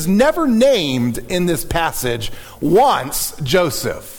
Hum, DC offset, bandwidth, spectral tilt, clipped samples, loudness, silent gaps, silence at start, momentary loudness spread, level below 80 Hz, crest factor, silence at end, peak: none; under 0.1%; 19 kHz; -4.5 dB/octave; under 0.1%; -17 LUFS; none; 0 s; 9 LU; -36 dBFS; 14 dB; 0 s; -4 dBFS